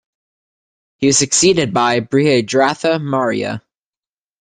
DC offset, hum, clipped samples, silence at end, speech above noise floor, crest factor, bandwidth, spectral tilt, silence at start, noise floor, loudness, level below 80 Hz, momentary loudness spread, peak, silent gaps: under 0.1%; none; under 0.1%; 0.8 s; over 75 dB; 16 dB; 10 kHz; -3.5 dB/octave; 1 s; under -90 dBFS; -15 LUFS; -54 dBFS; 7 LU; 0 dBFS; none